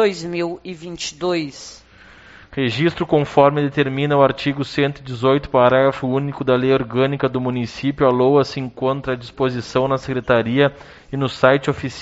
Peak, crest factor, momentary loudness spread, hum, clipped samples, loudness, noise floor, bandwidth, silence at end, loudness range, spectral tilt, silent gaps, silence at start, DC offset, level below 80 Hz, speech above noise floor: 0 dBFS; 18 dB; 10 LU; none; under 0.1%; -18 LUFS; -45 dBFS; 8 kHz; 0 s; 3 LU; -5 dB/octave; none; 0 s; under 0.1%; -48 dBFS; 27 dB